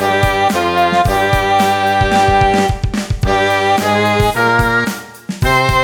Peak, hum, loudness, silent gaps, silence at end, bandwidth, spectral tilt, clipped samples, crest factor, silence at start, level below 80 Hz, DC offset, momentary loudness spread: -2 dBFS; none; -13 LUFS; none; 0 s; 19 kHz; -5 dB/octave; under 0.1%; 12 dB; 0 s; -26 dBFS; under 0.1%; 7 LU